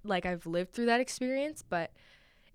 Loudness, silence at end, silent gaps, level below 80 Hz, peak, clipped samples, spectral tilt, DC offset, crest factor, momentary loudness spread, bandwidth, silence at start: -33 LUFS; 0.7 s; none; -62 dBFS; -16 dBFS; under 0.1%; -4.5 dB/octave; under 0.1%; 18 dB; 7 LU; 16 kHz; 0.05 s